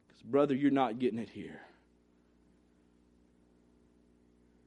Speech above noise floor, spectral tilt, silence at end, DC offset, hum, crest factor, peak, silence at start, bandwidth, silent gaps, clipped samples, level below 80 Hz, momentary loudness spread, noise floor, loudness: 36 dB; -8 dB/octave; 3 s; under 0.1%; 60 Hz at -65 dBFS; 20 dB; -16 dBFS; 0.25 s; 9 kHz; none; under 0.1%; -74 dBFS; 19 LU; -68 dBFS; -32 LUFS